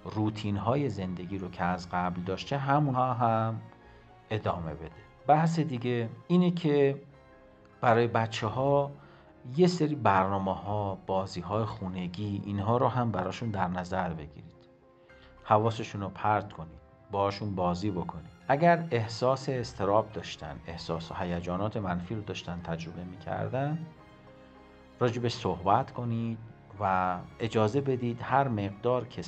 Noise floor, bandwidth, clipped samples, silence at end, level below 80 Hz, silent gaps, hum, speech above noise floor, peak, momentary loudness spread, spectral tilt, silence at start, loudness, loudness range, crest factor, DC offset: -58 dBFS; 8.4 kHz; under 0.1%; 0 s; -60 dBFS; none; none; 29 dB; -8 dBFS; 12 LU; -7 dB/octave; 0 s; -30 LUFS; 6 LU; 22 dB; under 0.1%